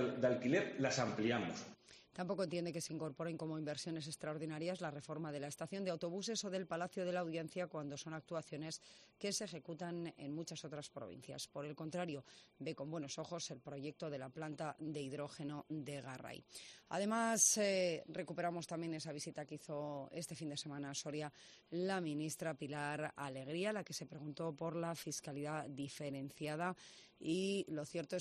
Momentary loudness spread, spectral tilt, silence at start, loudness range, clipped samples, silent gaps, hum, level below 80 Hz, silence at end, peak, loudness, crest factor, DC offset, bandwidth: 11 LU; -4 dB/octave; 0 s; 9 LU; under 0.1%; none; none; -82 dBFS; 0 s; -20 dBFS; -43 LUFS; 24 dB; under 0.1%; 13 kHz